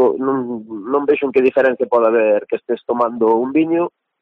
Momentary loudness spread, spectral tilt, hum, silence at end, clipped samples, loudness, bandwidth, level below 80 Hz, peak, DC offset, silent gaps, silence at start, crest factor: 8 LU; -8.5 dB/octave; none; 0.35 s; under 0.1%; -17 LUFS; 4.8 kHz; -62 dBFS; -4 dBFS; under 0.1%; none; 0 s; 12 dB